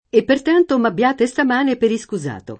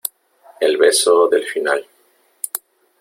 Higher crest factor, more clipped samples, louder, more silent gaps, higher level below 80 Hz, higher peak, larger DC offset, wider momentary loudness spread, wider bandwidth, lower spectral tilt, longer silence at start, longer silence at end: about the same, 16 dB vs 16 dB; neither; about the same, -17 LUFS vs -16 LUFS; neither; first, -54 dBFS vs -68 dBFS; about the same, -2 dBFS vs -2 dBFS; neither; second, 8 LU vs 15 LU; second, 8.8 kHz vs 16.5 kHz; first, -5.5 dB/octave vs 0 dB/octave; about the same, 0.15 s vs 0.05 s; second, 0.05 s vs 0.45 s